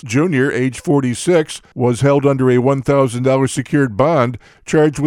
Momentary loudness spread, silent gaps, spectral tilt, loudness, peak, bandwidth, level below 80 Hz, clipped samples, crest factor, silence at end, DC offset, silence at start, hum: 5 LU; none; -6.5 dB/octave; -15 LUFS; 0 dBFS; 13 kHz; -46 dBFS; under 0.1%; 14 dB; 0 s; under 0.1%; 0.05 s; none